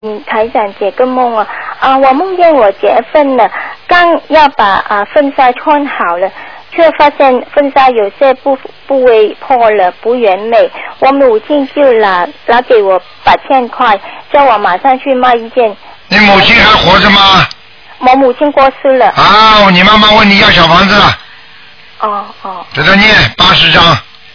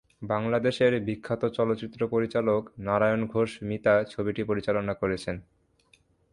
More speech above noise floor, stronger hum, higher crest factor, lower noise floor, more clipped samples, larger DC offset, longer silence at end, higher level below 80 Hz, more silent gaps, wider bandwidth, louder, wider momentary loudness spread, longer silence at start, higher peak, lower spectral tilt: second, 29 dB vs 37 dB; neither; second, 8 dB vs 18 dB; second, -36 dBFS vs -64 dBFS; first, 4% vs under 0.1%; first, 1% vs under 0.1%; second, 0.35 s vs 0.9 s; first, -32 dBFS vs -56 dBFS; neither; second, 5.4 kHz vs 11 kHz; first, -7 LUFS vs -27 LUFS; first, 10 LU vs 7 LU; second, 0 s vs 0.2 s; first, 0 dBFS vs -10 dBFS; second, -5 dB/octave vs -7 dB/octave